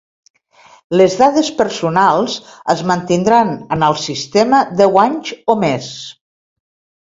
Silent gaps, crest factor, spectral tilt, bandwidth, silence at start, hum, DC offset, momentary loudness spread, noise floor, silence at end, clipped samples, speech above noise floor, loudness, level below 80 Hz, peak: none; 16 dB; -5 dB/octave; 7.8 kHz; 0.9 s; none; under 0.1%; 10 LU; -47 dBFS; 0.95 s; under 0.1%; 33 dB; -14 LUFS; -54 dBFS; 0 dBFS